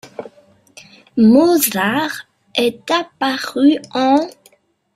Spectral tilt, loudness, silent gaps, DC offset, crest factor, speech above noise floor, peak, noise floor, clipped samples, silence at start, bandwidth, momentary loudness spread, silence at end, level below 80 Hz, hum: -4 dB/octave; -16 LUFS; none; under 0.1%; 16 dB; 39 dB; -2 dBFS; -54 dBFS; under 0.1%; 0.05 s; 16 kHz; 16 LU; 0.65 s; -60 dBFS; none